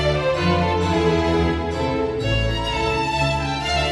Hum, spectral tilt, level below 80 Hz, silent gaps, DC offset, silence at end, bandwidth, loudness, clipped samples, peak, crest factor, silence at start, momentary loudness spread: none; -5.5 dB/octave; -32 dBFS; none; under 0.1%; 0 s; 11.5 kHz; -20 LUFS; under 0.1%; -6 dBFS; 14 dB; 0 s; 4 LU